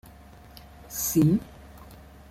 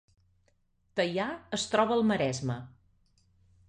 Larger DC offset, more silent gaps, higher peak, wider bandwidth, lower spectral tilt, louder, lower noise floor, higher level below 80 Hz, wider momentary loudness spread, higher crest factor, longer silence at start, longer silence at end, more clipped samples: neither; neither; about the same, -10 dBFS vs -12 dBFS; first, 16.5 kHz vs 10.5 kHz; about the same, -6 dB/octave vs -5 dB/octave; first, -25 LUFS vs -30 LUFS; second, -49 dBFS vs -71 dBFS; first, -50 dBFS vs -64 dBFS; first, 26 LU vs 10 LU; about the same, 18 dB vs 20 dB; second, 0.8 s vs 0.95 s; second, 0.35 s vs 1 s; neither